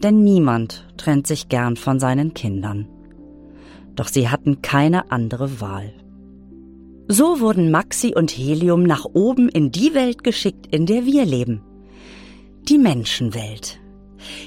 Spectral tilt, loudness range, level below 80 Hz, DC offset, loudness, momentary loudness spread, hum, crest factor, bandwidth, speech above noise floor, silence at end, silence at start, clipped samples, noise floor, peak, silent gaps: -5.5 dB/octave; 5 LU; -48 dBFS; under 0.1%; -18 LUFS; 15 LU; none; 16 dB; 16.5 kHz; 25 dB; 0 s; 0 s; under 0.1%; -42 dBFS; -2 dBFS; none